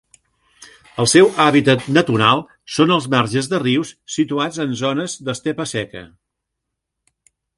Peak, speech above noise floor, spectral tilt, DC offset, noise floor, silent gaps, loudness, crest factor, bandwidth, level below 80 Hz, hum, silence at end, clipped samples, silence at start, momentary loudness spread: 0 dBFS; 62 dB; -4.5 dB/octave; under 0.1%; -79 dBFS; none; -17 LUFS; 18 dB; 11.5 kHz; -56 dBFS; none; 1.5 s; under 0.1%; 0.6 s; 13 LU